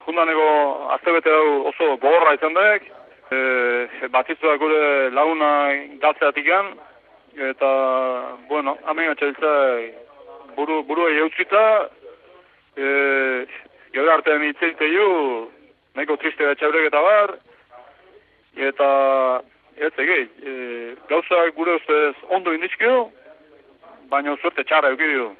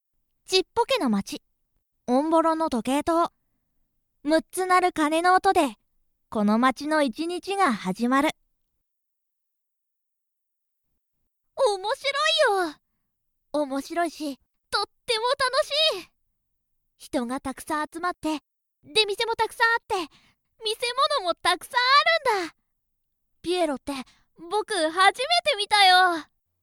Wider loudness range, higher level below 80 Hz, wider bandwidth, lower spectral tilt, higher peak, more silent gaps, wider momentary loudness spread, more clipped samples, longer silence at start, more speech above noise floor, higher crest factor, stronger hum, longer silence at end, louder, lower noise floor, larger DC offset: about the same, 4 LU vs 6 LU; second, -74 dBFS vs -62 dBFS; second, 4.4 kHz vs 17 kHz; first, -6.5 dB/octave vs -3 dB/octave; first, -2 dBFS vs -6 dBFS; neither; about the same, 12 LU vs 13 LU; neither; second, 0.05 s vs 0.5 s; second, 34 dB vs 57 dB; about the same, 18 dB vs 20 dB; neither; second, 0.05 s vs 0.4 s; first, -19 LUFS vs -23 LUFS; second, -53 dBFS vs -80 dBFS; neither